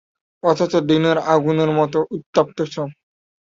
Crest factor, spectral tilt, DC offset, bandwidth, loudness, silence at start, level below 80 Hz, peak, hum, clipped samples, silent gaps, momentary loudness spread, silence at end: 18 dB; -6.5 dB/octave; under 0.1%; 7.6 kHz; -19 LUFS; 0.45 s; -60 dBFS; -2 dBFS; none; under 0.1%; 2.26-2.33 s; 9 LU; 0.5 s